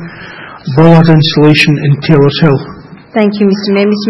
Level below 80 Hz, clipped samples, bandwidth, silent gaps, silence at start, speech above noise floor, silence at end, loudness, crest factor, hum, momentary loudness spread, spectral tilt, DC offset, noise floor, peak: -40 dBFS; 2%; 9.6 kHz; none; 0 s; 21 dB; 0 s; -8 LUFS; 8 dB; none; 20 LU; -7.5 dB/octave; under 0.1%; -28 dBFS; 0 dBFS